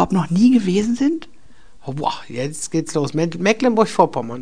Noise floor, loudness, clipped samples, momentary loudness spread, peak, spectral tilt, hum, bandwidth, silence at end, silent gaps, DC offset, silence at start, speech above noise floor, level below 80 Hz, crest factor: -51 dBFS; -19 LUFS; under 0.1%; 12 LU; 0 dBFS; -6 dB/octave; none; 10 kHz; 0 s; none; 2%; 0 s; 32 dB; -52 dBFS; 18 dB